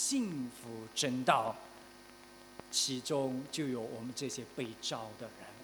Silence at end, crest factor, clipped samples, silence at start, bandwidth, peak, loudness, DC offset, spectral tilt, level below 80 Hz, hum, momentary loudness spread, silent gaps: 0 s; 26 dB; under 0.1%; 0 s; 19 kHz; -12 dBFS; -36 LUFS; under 0.1%; -3 dB/octave; -74 dBFS; none; 21 LU; none